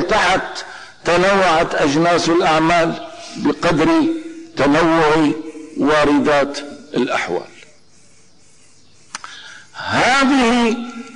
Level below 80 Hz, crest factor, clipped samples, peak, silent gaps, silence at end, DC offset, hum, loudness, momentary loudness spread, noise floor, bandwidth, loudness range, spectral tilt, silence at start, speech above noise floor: -44 dBFS; 10 dB; under 0.1%; -8 dBFS; none; 0 s; under 0.1%; none; -16 LUFS; 17 LU; -51 dBFS; 10.5 kHz; 8 LU; -4.5 dB/octave; 0 s; 36 dB